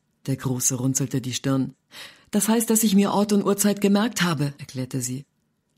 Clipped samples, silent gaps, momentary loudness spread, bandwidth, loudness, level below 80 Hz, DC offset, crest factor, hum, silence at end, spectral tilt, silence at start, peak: under 0.1%; none; 13 LU; 16 kHz; -23 LUFS; -62 dBFS; under 0.1%; 16 dB; none; 0.55 s; -4.5 dB/octave; 0.25 s; -6 dBFS